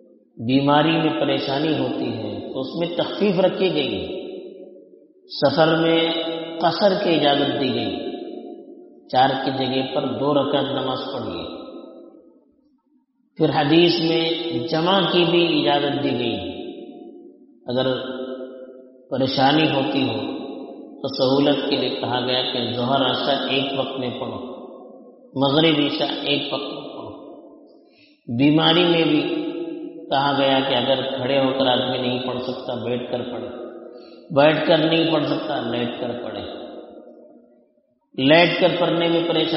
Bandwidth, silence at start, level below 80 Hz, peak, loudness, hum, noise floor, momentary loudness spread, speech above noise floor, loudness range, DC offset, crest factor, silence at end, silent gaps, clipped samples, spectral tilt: 6 kHz; 0.35 s; -62 dBFS; 0 dBFS; -20 LUFS; none; -63 dBFS; 17 LU; 43 dB; 5 LU; under 0.1%; 20 dB; 0 s; none; under 0.1%; -3.5 dB/octave